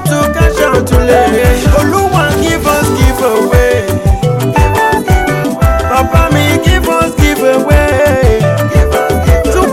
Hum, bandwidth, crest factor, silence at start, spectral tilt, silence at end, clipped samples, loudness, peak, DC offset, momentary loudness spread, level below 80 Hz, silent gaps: none; 16.5 kHz; 8 dB; 0 s; -5.5 dB/octave; 0 s; under 0.1%; -10 LUFS; 0 dBFS; under 0.1%; 3 LU; -16 dBFS; none